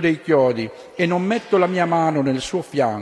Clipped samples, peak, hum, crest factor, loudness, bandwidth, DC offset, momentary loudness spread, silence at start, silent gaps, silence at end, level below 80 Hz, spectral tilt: under 0.1%; -4 dBFS; none; 14 dB; -20 LUFS; 11 kHz; under 0.1%; 6 LU; 0 s; none; 0 s; -56 dBFS; -6 dB/octave